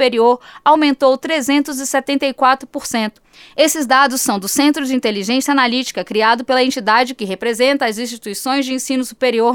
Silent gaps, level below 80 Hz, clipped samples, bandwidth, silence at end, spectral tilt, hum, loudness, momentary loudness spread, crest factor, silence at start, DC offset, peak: none; -60 dBFS; under 0.1%; 19.5 kHz; 0 s; -2.5 dB/octave; none; -16 LUFS; 8 LU; 14 dB; 0 s; under 0.1%; 0 dBFS